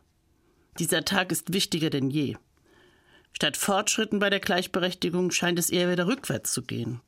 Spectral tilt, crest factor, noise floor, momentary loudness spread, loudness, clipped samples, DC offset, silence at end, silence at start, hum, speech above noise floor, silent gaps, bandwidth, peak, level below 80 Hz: -3.5 dB/octave; 22 dB; -66 dBFS; 6 LU; -26 LUFS; under 0.1%; under 0.1%; 0.1 s; 0.75 s; none; 39 dB; none; 16 kHz; -6 dBFS; -62 dBFS